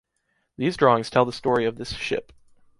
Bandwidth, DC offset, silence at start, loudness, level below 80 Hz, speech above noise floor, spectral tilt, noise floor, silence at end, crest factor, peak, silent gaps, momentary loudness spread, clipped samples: 11.5 kHz; under 0.1%; 0.6 s; -23 LUFS; -52 dBFS; 50 dB; -5.5 dB/octave; -73 dBFS; 0.55 s; 22 dB; -4 dBFS; none; 10 LU; under 0.1%